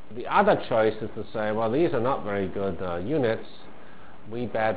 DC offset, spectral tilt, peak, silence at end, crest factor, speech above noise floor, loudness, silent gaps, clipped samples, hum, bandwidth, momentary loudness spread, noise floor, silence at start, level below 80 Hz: 2%; -10.5 dB/octave; -8 dBFS; 0 s; 20 dB; 23 dB; -26 LUFS; none; under 0.1%; none; 4 kHz; 13 LU; -49 dBFS; 0.1 s; -52 dBFS